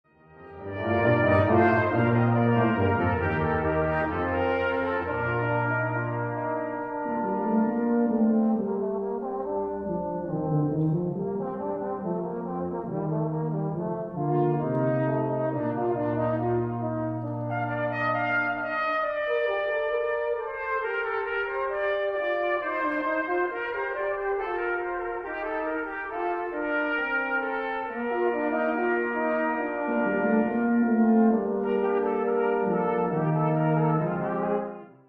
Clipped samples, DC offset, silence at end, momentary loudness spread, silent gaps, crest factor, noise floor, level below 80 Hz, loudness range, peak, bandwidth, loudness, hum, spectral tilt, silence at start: under 0.1%; under 0.1%; 0.15 s; 8 LU; none; 18 dB; -49 dBFS; -54 dBFS; 5 LU; -8 dBFS; 5.4 kHz; -27 LUFS; none; -10 dB/octave; 0.35 s